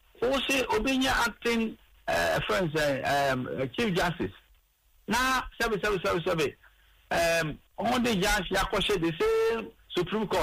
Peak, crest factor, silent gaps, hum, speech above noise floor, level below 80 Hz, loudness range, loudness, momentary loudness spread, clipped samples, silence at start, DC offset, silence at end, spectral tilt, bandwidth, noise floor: -16 dBFS; 12 dB; none; none; 37 dB; -46 dBFS; 2 LU; -28 LUFS; 7 LU; under 0.1%; 0.2 s; under 0.1%; 0 s; -4 dB/octave; 15.5 kHz; -64 dBFS